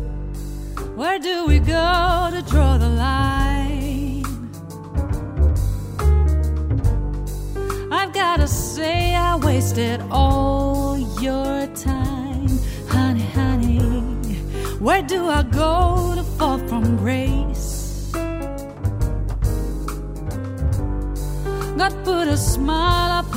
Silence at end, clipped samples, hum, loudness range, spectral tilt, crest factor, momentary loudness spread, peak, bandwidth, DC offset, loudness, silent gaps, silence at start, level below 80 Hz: 0 s; under 0.1%; none; 5 LU; -6 dB/octave; 16 dB; 10 LU; -4 dBFS; 16 kHz; under 0.1%; -21 LUFS; none; 0 s; -24 dBFS